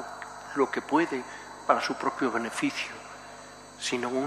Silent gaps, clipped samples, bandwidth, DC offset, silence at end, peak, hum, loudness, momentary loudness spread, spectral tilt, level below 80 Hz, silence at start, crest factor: none; under 0.1%; 14.5 kHz; under 0.1%; 0 s; -8 dBFS; 50 Hz at -60 dBFS; -29 LUFS; 17 LU; -3.5 dB/octave; -66 dBFS; 0 s; 24 dB